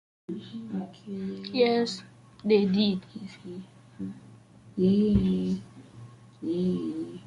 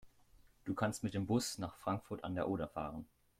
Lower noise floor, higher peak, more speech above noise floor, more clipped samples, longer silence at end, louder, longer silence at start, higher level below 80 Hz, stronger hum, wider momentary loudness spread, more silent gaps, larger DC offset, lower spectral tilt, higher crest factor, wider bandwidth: second, -52 dBFS vs -67 dBFS; first, -10 dBFS vs -22 dBFS; about the same, 25 dB vs 28 dB; neither; second, 0.05 s vs 0.35 s; first, -28 LUFS vs -40 LUFS; first, 0.3 s vs 0.05 s; first, -50 dBFS vs -64 dBFS; neither; first, 20 LU vs 9 LU; neither; neither; first, -7.5 dB/octave vs -5.5 dB/octave; about the same, 20 dB vs 20 dB; second, 10.5 kHz vs 16 kHz